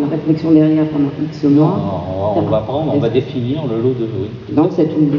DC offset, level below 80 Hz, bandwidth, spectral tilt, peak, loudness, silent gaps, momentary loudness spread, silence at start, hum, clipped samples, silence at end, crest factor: under 0.1%; -48 dBFS; 6 kHz; -10 dB/octave; 0 dBFS; -16 LUFS; none; 8 LU; 0 s; none; under 0.1%; 0 s; 14 dB